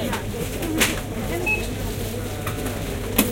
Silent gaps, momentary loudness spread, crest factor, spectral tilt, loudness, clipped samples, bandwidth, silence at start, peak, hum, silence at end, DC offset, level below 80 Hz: none; 7 LU; 24 dB; -4 dB/octave; -25 LUFS; under 0.1%; 17 kHz; 0 s; 0 dBFS; none; 0 s; under 0.1%; -34 dBFS